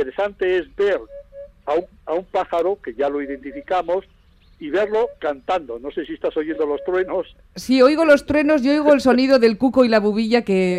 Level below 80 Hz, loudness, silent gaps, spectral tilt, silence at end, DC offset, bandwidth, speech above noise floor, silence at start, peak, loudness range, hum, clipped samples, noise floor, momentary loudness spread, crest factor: -50 dBFS; -19 LUFS; none; -6 dB/octave; 0 s; under 0.1%; 14 kHz; 21 dB; 0 s; 0 dBFS; 8 LU; none; under 0.1%; -39 dBFS; 14 LU; 18 dB